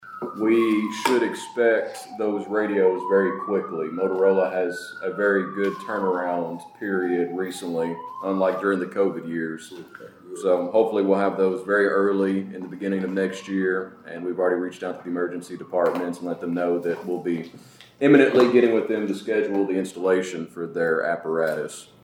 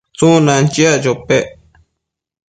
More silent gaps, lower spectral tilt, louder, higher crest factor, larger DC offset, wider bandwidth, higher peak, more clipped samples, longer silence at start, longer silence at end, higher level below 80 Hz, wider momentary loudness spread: neither; about the same, -6 dB/octave vs -5 dB/octave; second, -23 LUFS vs -12 LUFS; first, 22 dB vs 14 dB; neither; first, 16.5 kHz vs 9.4 kHz; about the same, -2 dBFS vs 0 dBFS; neither; second, 0 s vs 0.2 s; second, 0.2 s vs 1.05 s; second, -76 dBFS vs -48 dBFS; first, 11 LU vs 6 LU